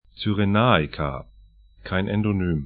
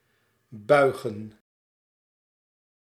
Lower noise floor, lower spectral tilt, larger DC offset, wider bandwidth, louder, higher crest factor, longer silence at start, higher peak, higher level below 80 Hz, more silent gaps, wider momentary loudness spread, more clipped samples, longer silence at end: second, -51 dBFS vs -70 dBFS; first, -11.5 dB/octave vs -6 dB/octave; neither; second, 4.9 kHz vs 14.5 kHz; about the same, -23 LUFS vs -23 LUFS; about the same, 22 dB vs 24 dB; second, 0.15 s vs 0.55 s; first, 0 dBFS vs -6 dBFS; first, -42 dBFS vs -74 dBFS; neither; second, 12 LU vs 23 LU; neither; second, 0 s vs 1.65 s